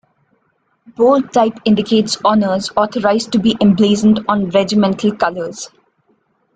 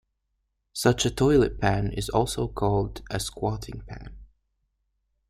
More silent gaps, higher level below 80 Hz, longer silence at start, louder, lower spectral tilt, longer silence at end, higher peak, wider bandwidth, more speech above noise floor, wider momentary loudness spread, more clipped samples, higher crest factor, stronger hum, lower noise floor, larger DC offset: neither; second, -52 dBFS vs -42 dBFS; first, 1 s vs 0.75 s; first, -14 LUFS vs -25 LUFS; about the same, -5.5 dB/octave vs -5.5 dB/octave; second, 0.9 s vs 1.05 s; first, -2 dBFS vs -6 dBFS; second, 9.2 kHz vs 15.5 kHz; about the same, 49 dB vs 52 dB; second, 7 LU vs 18 LU; neither; second, 14 dB vs 22 dB; neither; second, -63 dBFS vs -77 dBFS; neither